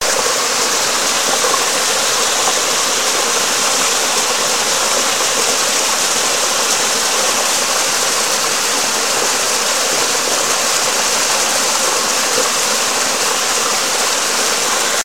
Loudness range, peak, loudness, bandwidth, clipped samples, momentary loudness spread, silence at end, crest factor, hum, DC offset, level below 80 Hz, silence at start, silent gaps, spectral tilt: 0 LU; 0 dBFS; -13 LUFS; 16.5 kHz; under 0.1%; 1 LU; 0 s; 16 dB; none; 1%; -56 dBFS; 0 s; none; 1 dB/octave